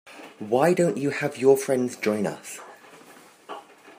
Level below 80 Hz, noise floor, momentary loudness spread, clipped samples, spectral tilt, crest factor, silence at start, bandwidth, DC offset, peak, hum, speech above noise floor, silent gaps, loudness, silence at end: -74 dBFS; -50 dBFS; 21 LU; under 0.1%; -5.5 dB/octave; 20 dB; 0.05 s; 15.5 kHz; under 0.1%; -6 dBFS; none; 28 dB; none; -23 LUFS; 0.05 s